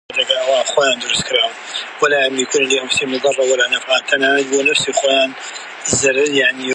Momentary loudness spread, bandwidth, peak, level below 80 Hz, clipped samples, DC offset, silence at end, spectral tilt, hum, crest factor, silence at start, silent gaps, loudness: 5 LU; 11.5 kHz; 0 dBFS; -56 dBFS; under 0.1%; under 0.1%; 0 s; -1.5 dB/octave; none; 16 dB; 0.1 s; none; -15 LUFS